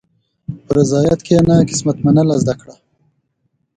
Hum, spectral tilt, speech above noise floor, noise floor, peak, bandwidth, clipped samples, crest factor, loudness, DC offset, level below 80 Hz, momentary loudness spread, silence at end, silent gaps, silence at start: none; -7 dB/octave; 54 dB; -67 dBFS; 0 dBFS; 9.4 kHz; under 0.1%; 16 dB; -14 LUFS; under 0.1%; -42 dBFS; 18 LU; 1.05 s; none; 0.5 s